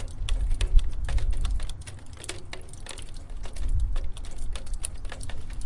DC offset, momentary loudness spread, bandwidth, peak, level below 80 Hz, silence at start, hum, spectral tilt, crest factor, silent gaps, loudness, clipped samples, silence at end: 0.2%; 13 LU; 11.5 kHz; -4 dBFS; -28 dBFS; 0 s; none; -4 dB/octave; 22 dB; none; -34 LUFS; under 0.1%; 0 s